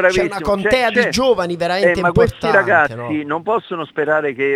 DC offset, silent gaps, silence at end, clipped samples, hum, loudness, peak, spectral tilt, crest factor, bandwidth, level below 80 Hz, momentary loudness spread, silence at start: under 0.1%; none; 0 s; under 0.1%; none; -16 LUFS; 0 dBFS; -5 dB/octave; 16 dB; 14 kHz; -40 dBFS; 7 LU; 0 s